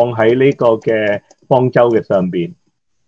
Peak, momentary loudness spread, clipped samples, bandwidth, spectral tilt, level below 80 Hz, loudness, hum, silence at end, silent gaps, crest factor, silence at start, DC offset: 0 dBFS; 9 LU; under 0.1%; 7.4 kHz; -8.5 dB/octave; -58 dBFS; -14 LUFS; none; 0.55 s; none; 14 dB; 0 s; under 0.1%